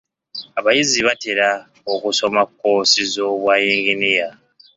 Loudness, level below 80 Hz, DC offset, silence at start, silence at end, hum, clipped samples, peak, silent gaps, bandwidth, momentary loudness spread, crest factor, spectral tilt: -17 LUFS; -62 dBFS; under 0.1%; 0.35 s; 0.45 s; none; under 0.1%; -2 dBFS; none; 8 kHz; 11 LU; 16 dB; -1.5 dB/octave